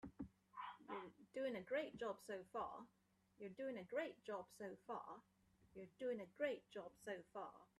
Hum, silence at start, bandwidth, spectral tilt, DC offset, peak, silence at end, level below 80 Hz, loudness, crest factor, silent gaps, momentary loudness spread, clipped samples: none; 0.05 s; 13 kHz; -5 dB/octave; under 0.1%; -32 dBFS; 0.15 s; -80 dBFS; -51 LUFS; 20 dB; none; 13 LU; under 0.1%